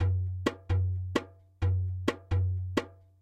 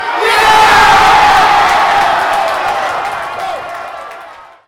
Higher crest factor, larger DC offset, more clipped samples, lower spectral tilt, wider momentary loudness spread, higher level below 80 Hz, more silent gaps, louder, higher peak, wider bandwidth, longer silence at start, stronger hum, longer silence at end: first, 18 dB vs 10 dB; neither; neither; first, -7 dB/octave vs -2 dB/octave; second, 5 LU vs 18 LU; second, -46 dBFS vs -38 dBFS; neither; second, -32 LUFS vs -9 LUFS; second, -12 dBFS vs 0 dBFS; second, 8.8 kHz vs 17 kHz; about the same, 0 s vs 0 s; neither; about the same, 0.25 s vs 0.2 s